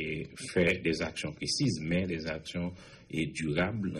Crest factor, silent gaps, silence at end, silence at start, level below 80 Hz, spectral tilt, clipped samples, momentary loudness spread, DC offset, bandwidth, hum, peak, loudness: 18 dB; none; 0 s; 0 s; -54 dBFS; -5 dB/octave; under 0.1%; 10 LU; under 0.1%; 12 kHz; none; -14 dBFS; -32 LUFS